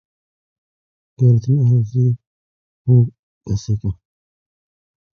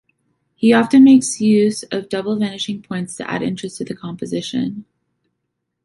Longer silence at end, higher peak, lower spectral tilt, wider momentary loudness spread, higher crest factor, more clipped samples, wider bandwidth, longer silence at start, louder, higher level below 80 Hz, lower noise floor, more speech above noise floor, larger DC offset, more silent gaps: first, 1.2 s vs 1.05 s; about the same, -2 dBFS vs -2 dBFS; first, -10 dB/octave vs -5 dB/octave; second, 12 LU vs 17 LU; about the same, 16 dB vs 16 dB; neither; second, 6.8 kHz vs 11.5 kHz; first, 1.2 s vs 0.6 s; about the same, -18 LUFS vs -17 LUFS; first, -44 dBFS vs -60 dBFS; first, under -90 dBFS vs -75 dBFS; first, over 75 dB vs 59 dB; neither; first, 2.27-2.85 s, 3.19-3.41 s vs none